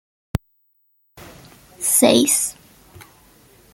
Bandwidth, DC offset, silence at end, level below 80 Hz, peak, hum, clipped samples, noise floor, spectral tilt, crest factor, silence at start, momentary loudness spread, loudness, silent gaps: 16.5 kHz; under 0.1%; 1.2 s; -48 dBFS; -2 dBFS; none; under 0.1%; -64 dBFS; -3 dB/octave; 22 dB; 0.35 s; 16 LU; -17 LUFS; none